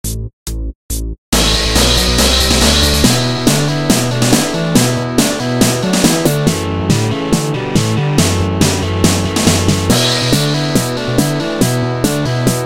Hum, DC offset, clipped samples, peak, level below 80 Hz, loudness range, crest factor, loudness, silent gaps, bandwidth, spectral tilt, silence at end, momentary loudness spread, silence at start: none; 0.9%; 0.1%; 0 dBFS; -24 dBFS; 3 LU; 14 dB; -13 LUFS; 0.33-0.46 s, 0.75-0.89 s, 1.18-1.32 s; 17 kHz; -4 dB/octave; 0 s; 6 LU; 0.05 s